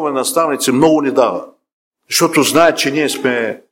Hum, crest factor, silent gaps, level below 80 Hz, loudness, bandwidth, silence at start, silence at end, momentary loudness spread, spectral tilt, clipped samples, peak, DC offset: none; 14 dB; 1.73-1.92 s; -54 dBFS; -13 LUFS; 16.5 kHz; 0 s; 0.15 s; 6 LU; -3.5 dB/octave; under 0.1%; 0 dBFS; under 0.1%